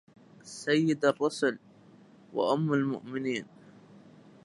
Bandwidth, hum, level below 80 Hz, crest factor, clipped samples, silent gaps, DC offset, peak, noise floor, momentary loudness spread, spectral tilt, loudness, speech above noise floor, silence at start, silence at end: 11.5 kHz; none; -80 dBFS; 20 dB; under 0.1%; none; under 0.1%; -12 dBFS; -56 dBFS; 13 LU; -5.5 dB/octave; -29 LUFS; 27 dB; 0.45 s; 1 s